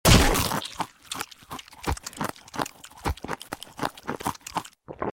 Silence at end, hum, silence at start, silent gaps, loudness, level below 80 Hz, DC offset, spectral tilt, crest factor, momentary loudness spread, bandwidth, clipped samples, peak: 0.05 s; none; 0.05 s; none; -29 LUFS; -34 dBFS; under 0.1%; -4 dB/octave; 22 dB; 12 LU; 17 kHz; under 0.1%; -6 dBFS